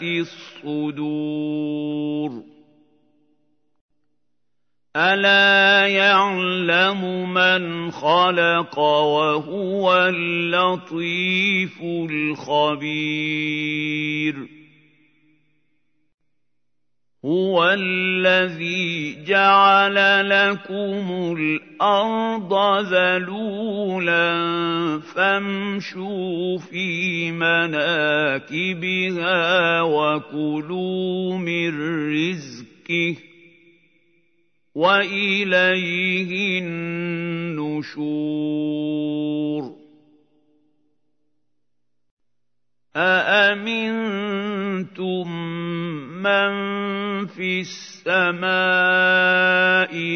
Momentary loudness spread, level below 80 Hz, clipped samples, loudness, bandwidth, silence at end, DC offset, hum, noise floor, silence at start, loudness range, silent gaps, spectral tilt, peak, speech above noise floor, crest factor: 11 LU; -76 dBFS; under 0.1%; -20 LUFS; 6.6 kHz; 0 s; under 0.1%; 60 Hz at -60 dBFS; -81 dBFS; 0 s; 11 LU; 3.81-3.89 s, 16.14-16.18 s, 42.11-42.17 s; -5.5 dB/octave; -2 dBFS; 61 dB; 18 dB